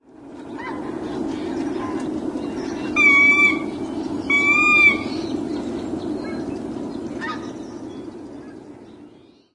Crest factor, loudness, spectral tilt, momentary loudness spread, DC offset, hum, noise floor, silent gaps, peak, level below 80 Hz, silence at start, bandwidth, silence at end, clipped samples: 18 dB; -19 LUFS; -4.5 dB/octave; 22 LU; under 0.1%; none; -48 dBFS; none; -4 dBFS; -52 dBFS; 0.15 s; 11.5 kHz; 0.4 s; under 0.1%